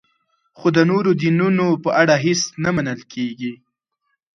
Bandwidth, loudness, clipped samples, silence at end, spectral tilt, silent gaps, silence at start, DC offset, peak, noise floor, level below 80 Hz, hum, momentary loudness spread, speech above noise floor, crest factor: 7.4 kHz; -18 LUFS; under 0.1%; 0.8 s; -5.5 dB/octave; none; 0.6 s; under 0.1%; 0 dBFS; -73 dBFS; -58 dBFS; none; 11 LU; 55 dB; 18 dB